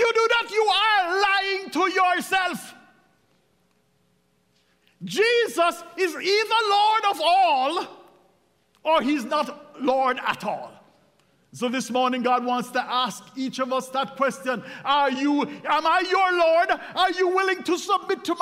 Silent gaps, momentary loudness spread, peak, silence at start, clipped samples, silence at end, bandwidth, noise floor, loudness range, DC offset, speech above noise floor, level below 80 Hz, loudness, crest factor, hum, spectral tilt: none; 10 LU; -8 dBFS; 0 s; under 0.1%; 0 s; 16 kHz; -66 dBFS; 5 LU; under 0.1%; 43 dB; -70 dBFS; -22 LUFS; 16 dB; none; -3 dB/octave